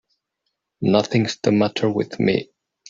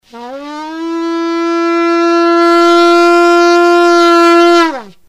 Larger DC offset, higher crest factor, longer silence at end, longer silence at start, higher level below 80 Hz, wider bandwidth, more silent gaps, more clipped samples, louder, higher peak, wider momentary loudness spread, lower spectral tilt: neither; first, 18 dB vs 10 dB; first, 0.45 s vs 0.2 s; first, 0.8 s vs 0.15 s; about the same, -58 dBFS vs -58 dBFS; second, 7.6 kHz vs 11.5 kHz; neither; second, under 0.1% vs 0.8%; second, -20 LUFS vs -8 LUFS; second, -4 dBFS vs 0 dBFS; second, 5 LU vs 16 LU; first, -6 dB/octave vs -2.5 dB/octave